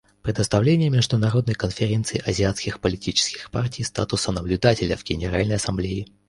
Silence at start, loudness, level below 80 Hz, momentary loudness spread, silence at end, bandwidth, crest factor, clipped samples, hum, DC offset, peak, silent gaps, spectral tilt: 0.25 s; -23 LUFS; -40 dBFS; 7 LU; 0.25 s; 11.5 kHz; 20 dB; under 0.1%; none; under 0.1%; -2 dBFS; none; -5 dB/octave